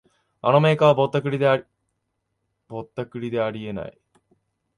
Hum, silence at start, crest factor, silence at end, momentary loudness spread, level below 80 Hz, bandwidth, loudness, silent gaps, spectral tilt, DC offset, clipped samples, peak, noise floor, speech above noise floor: none; 0.45 s; 20 dB; 0.85 s; 17 LU; -62 dBFS; 11 kHz; -21 LUFS; none; -7.5 dB/octave; under 0.1%; under 0.1%; -4 dBFS; -76 dBFS; 55 dB